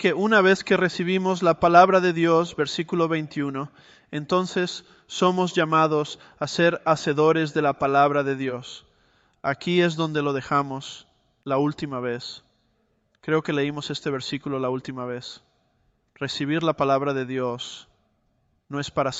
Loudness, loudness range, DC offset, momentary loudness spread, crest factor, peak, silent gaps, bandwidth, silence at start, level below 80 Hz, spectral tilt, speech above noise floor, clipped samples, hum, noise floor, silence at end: -23 LUFS; 8 LU; under 0.1%; 15 LU; 22 dB; -2 dBFS; none; 8.2 kHz; 0 s; -62 dBFS; -5.5 dB/octave; 45 dB; under 0.1%; none; -68 dBFS; 0 s